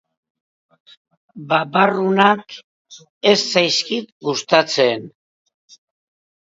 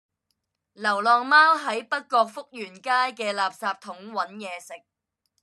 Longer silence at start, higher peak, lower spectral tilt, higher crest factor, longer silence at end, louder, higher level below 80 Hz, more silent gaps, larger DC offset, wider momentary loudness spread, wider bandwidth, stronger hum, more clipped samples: first, 1.35 s vs 0.8 s; first, 0 dBFS vs -6 dBFS; about the same, -3.5 dB/octave vs -2.5 dB/octave; about the same, 20 dB vs 20 dB; first, 1.4 s vs 0.65 s; first, -17 LUFS vs -23 LUFS; first, -70 dBFS vs -90 dBFS; first, 2.64-2.85 s, 3.10-3.21 s, 4.12-4.21 s vs none; neither; second, 12 LU vs 19 LU; second, 8 kHz vs 12.5 kHz; neither; neither